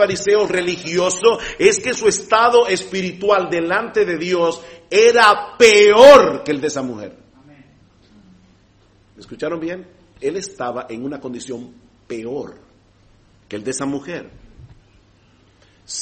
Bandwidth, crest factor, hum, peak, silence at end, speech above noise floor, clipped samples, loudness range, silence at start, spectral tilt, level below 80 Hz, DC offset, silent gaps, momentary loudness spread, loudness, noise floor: 8.8 kHz; 18 dB; none; 0 dBFS; 0 s; 38 dB; 0.3%; 19 LU; 0 s; -3 dB/octave; -52 dBFS; under 0.1%; none; 20 LU; -15 LUFS; -53 dBFS